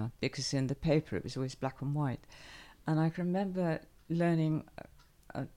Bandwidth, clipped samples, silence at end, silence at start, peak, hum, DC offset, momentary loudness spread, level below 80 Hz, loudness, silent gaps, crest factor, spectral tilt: 11.5 kHz; under 0.1%; 0.1 s; 0 s; -16 dBFS; none; under 0.1%; 15 LU; -58 dBFS; -34 LUFS; none; 18 dB; -6.5 dB/octave